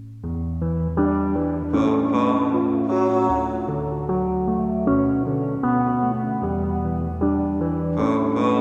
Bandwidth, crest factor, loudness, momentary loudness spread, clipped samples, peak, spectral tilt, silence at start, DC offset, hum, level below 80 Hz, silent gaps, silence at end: 7.2 kHz; 14 dB; -22 LUFS; 5 LU; under 0.1%; -8 dBFS; -9.5 dB/octave; 0 s; under 0.1%; none; -38 dBFS; none; 0 s